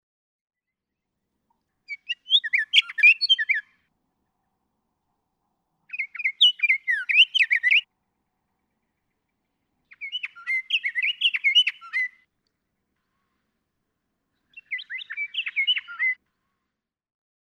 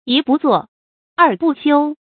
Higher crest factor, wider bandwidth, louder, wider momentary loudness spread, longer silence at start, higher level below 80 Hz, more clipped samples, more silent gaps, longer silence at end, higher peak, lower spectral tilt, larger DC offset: first, 22 dB vs 16 dB; first, 15 kHz vs 4.6 kHz; second, -20 LUFS vs -15 LUFS; first, 17 LU vs 5 LU; first, 1.9 s vs 0.05 s; second, -86 dBFS vs -66 dBFS; neither; second, none vs 0.68-1.16 s; first, 1.4 s vs 0.2 s; second, -6 dBFS vs 0 dBFS; second, 5.5 dB/octave vs -10 dB/octave; neither